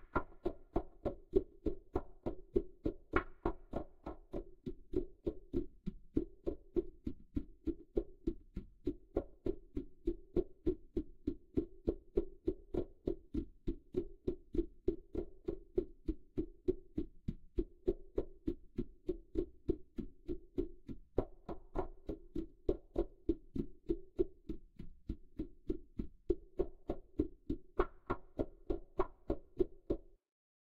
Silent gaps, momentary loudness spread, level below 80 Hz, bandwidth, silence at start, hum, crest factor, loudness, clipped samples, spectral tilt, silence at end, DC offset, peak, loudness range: none; 9 LU; -48 dBFS; 5 kHz; 0 s; none; 28 dB; -43 LUFS; under 0.1%; -10 dB/octave; 0.6 s; under 0.1%; -14 dBFS; 3 LU